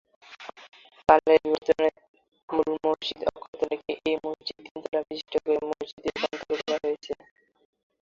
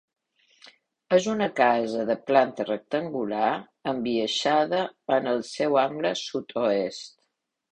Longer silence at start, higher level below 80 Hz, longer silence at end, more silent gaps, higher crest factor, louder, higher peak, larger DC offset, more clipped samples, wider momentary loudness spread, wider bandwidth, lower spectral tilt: second, 0.3 s vs 1.1 s; first, -60 dBFS vs -68 dBFS; first, 0.9 s vs 0.65 s; first, 2.08-2.14 s, 2.43-2.48 s, 3.48-3.53 s, 4.71-4.75 s, 5.93-5.97 s vs none; about the same, 24 dB vs 20 dB; about the same, -27 LUFS vs -25 LUFS; first, -2 dBFS vs -6 dBFS; neither; neither; first, 16 LU vs 9 LU; second, 7.4 kHz vs 10 kHz; about the same, -4.5 dB/octave vs -4.5 dB/octave